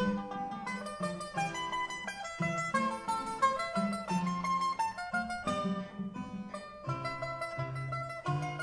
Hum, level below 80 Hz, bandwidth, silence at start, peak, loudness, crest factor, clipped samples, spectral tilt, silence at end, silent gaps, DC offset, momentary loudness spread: none; -62 dBFS; 11 kHz; 0 s; -16 dBFS; -35 LUFS; 18 dB; under 0.1%; -5 dB/octave; 0 s; none; under 0.1%; 8 LU